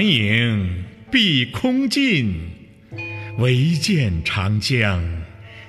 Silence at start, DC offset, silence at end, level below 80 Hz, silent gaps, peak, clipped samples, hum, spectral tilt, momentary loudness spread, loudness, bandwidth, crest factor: 0 s; under 0.1%; 0 s; -40 dBFS; none; -4 dBFS; under 0.1%; none; -5.5 dB/octave; 15 LU; -19 LUFS; 14 kHz; 16 dB